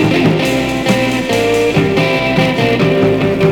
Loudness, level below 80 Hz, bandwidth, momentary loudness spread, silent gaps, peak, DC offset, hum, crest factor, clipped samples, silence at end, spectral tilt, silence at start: -13 LUFS; -36 dBFS; 18.5 kHz; 2 LU; none; 0 dBFS; 0.2%; none; 12 dB; under 0.1%; 0 s; -6 dB/octave; 0 s